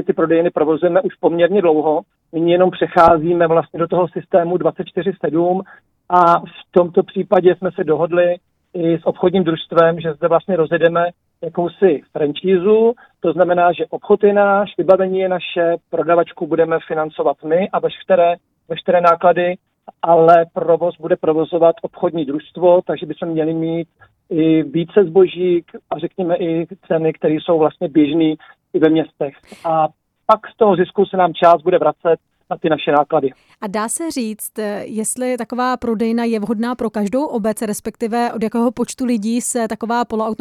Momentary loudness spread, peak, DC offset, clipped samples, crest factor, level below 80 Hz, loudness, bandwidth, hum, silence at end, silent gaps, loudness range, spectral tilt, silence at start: 10 LU; 0 dBFS; under 0.1%; under 0.1%; 16 dB; -56 dBFS; -16 LUFS; 14.5 kHz; none; 0.05 s; none; 5 LU; -6 dB/octave; 0 s